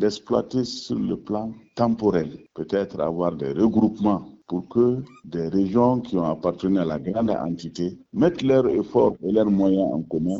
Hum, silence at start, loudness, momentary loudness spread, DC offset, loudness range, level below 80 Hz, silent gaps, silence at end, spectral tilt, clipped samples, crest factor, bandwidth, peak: none; 0 s; -23 LUFS; 10 LU; under 0.1%; 3 LU; -54 dBFS; none; 0 s; -7.5 dB/octave; under 0.1%; 16 dB; 7.8 kHz; -6 dBFS